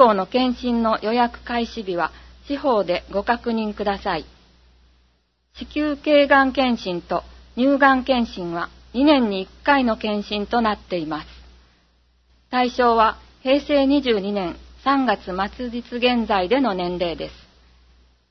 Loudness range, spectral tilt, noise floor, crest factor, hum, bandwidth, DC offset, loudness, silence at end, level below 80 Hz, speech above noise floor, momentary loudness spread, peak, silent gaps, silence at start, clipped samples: 5 LU; -6 dB/octave; -64 dBFS; 22 dB; none; 6.4 kHz; under 0.1%; -21 LUFS; 0.95 s; -46 dBFS; 44 dB; 12 LU; 0 dBFS; none; 0 s; under 0.1%